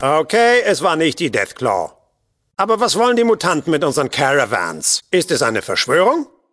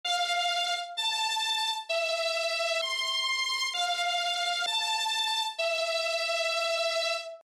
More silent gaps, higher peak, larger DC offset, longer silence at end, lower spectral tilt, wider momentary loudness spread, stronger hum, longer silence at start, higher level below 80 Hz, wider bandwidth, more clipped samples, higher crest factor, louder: neither; first, 0 dBFS vs -18 dBFS; neither; first, 0.25 s vs 0.05 s; first, -3 dB/octave vs 4 dB/octave; first, 6 LU vs 2 LU; neither; about the same, 0 s vs 0.05 s; first, -58 dBFS vs -80 dBFS; second, 11 kHz vs 16 kHz; neither; first, 16 dB vs 10 dB; first, -16 LUFS vs -28 LUFS